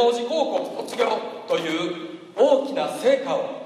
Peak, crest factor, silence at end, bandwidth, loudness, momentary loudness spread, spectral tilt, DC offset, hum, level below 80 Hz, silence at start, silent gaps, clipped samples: -6 dBFS; 18 dB; 0 s; 14 kHz; -23 LUFS; 10 LU; -4 dB/octave; under 0.1%; none; -82 dBFS; 0 s; none; under 0.1%